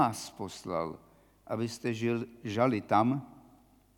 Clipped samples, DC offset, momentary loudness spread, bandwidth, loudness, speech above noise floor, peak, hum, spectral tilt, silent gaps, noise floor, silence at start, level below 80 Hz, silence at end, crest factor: under 0.1%; under 0.1%; 13 LU; 18 kHz; -32 LUFS; 31 dB; -12 dBFS; none; -6 dB/octave; none; -62 dBFS; 0 s; -68 dBFS; 0.6 s; 20 dB